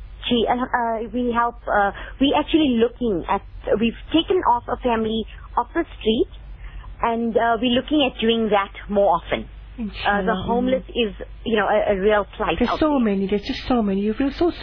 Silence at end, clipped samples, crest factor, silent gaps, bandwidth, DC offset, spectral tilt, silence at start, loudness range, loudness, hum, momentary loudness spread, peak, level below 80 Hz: 0 s; under 0.1%; 14 dB; none; 5.4 kHz; under 0.1%; -7.5 dB/octave; 0 s; 2 LU; -21 LUFS; none; 7 LU; -6 dBFS; -38 dBFS